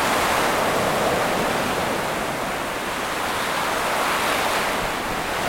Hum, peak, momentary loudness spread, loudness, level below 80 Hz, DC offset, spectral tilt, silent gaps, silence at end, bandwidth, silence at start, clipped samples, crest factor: none; -8 dBFS; 5 LU; -22 LUFS; -44 dBFS; under 0.1%; -3 dB/octave; none; 0 s; 16.5 kHz; 0 s; under 0.1%; 14 dB